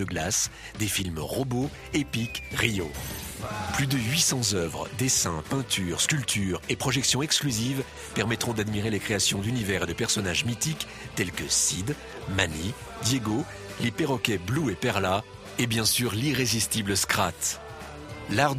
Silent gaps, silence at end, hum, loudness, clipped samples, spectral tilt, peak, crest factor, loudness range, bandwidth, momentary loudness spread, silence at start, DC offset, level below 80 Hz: none; 0 s; none; -27 LUFS; under 0.1%; -3 dB/octave; -6 dBFS; 22 dB; 3 LU; 15.5 kHz; 10 LU; 0 s; under 0.1%; -48 dBFS